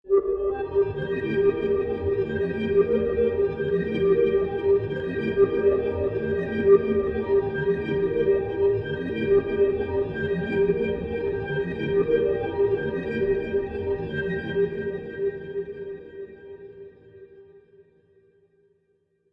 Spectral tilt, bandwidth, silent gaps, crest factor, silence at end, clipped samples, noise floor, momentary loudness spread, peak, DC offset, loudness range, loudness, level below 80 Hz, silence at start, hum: -9.5 dB/octave; 5 kHz; none; 18 dB; 1.75 s; under 0.1%; -69 dBFS; 9 LU; -6 dBFS; under 0.1%; 8 LU; -24 LUFS; -48 dBFS; 0.05 s; none